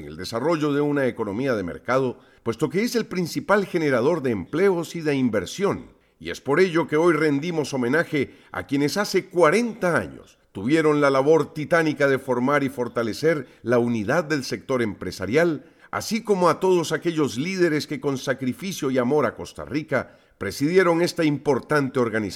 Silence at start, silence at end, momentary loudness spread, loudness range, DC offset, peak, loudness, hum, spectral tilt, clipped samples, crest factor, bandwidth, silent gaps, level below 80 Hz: 0 s; 0 s; 10 LU; 3 LU; under 0.1%; -4 dBFS; -23 LUFS; none; -5.5 dB/octave; under 0.1%; 18 dB; 16 kHz; none; -58 dBFS